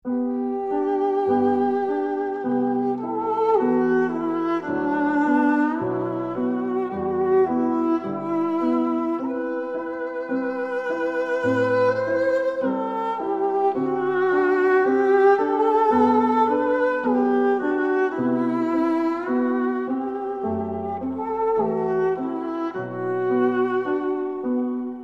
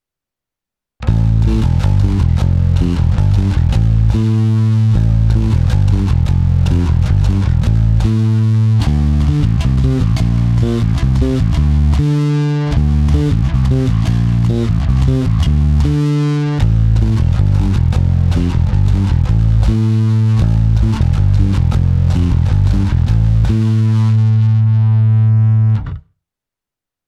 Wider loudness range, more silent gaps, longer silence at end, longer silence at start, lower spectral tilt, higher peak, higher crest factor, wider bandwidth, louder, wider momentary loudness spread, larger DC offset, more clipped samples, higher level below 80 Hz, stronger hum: first, 5 LU vs 1 LU; neither; second, 0 s vs 1.1 s; second, 0.05 s vs 1 s; about the same, -8 dB/octave vs -8.5 dB/octave; second, -6 dBFS vs 0 dBFS; about the same, 14 dB vs 12 dB; second, 7.2 kHz vs 8.2 kHz; second, -22 LUFS vs -13 LUFS; first, 8 LU vs 2 LU; neither; neither; second, -62 dBFS vs -18 dBFS; neither